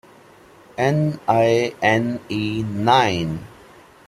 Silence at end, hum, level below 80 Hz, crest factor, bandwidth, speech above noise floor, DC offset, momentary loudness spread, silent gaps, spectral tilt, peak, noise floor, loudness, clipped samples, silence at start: 0.6 s; none; -54 dBFS; 18 dB; 14 kHz; 29 dB; under 0.1%; 9 LU; none; -6 dB/octave; -2 dBFS; -48 dBFS; -20 LUFS; under 0.1%; 0.8 s